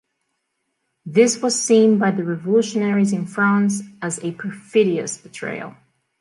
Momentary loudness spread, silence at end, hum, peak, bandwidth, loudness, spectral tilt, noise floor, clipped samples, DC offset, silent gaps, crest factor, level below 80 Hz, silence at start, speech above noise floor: 14 LU; 0.5 s; none; -2 dBFS; 11.5 kHz; -19 LUFS; -5 dB/octave; -74 dBFS; under 0.1%; under 0.1%; none; 18 dB; -70 dBFS; 1.05 s; 55 dB